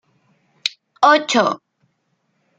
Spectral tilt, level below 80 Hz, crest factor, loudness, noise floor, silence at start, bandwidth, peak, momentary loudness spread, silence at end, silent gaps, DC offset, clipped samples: -2.5 dB/octave; -70 dBFS; 20 dB; -17 LUFS; -68 dBFS; 0.65 s; 9.6 kHz; 0 dBFS; 12 LU; 1 s; none; under 0.1%; under 0.1%